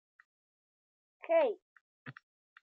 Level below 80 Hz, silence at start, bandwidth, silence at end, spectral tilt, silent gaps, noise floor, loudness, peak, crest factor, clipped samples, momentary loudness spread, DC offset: under -90 dBFS; 1.25 s; 4.6 kHz; 0.65 s; -3 dB/octave; 1.62-2.06 s; under -90 dBFS; -32 LUFS; -18 dBFS; 20 dB; under 0.1%; 22 LU; under 0.1%